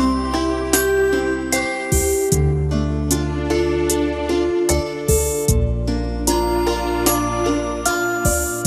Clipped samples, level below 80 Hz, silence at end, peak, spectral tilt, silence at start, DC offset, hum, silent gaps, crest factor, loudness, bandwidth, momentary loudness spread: under 0.1%; -26 dBFS; 0 s; 0 dBFS; -4.5 dB/octave; 0 s; under 0.1%; none; none; 18 dB; -19 LUFS; 15.5 kHz; 3 LU